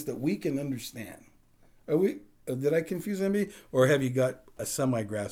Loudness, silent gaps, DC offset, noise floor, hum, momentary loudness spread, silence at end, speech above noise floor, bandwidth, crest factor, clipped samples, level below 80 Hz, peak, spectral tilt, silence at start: -29 LUFS; none; under 0.1%; -60 dBFS; none; 14 LU; 0 s; 31 dB; over 20 kHz; 18 dB; under 0.1%; -64 dBFS; -12 dBFS; -6 dB/octave; 0 s